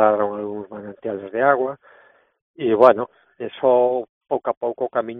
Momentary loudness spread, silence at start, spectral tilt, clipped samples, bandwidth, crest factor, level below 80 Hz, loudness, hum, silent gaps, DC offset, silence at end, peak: 18 LU; 0 s; -4.5 dB/octave; under 0.1%; 4.2 kHz; 20 dB; -66 dBFS; -20 LUFS; none; 2.42-2.54 s, 4.09-4.21 s, 4.57-4.61 s; under 0.1%; 0 s; 0 dBFS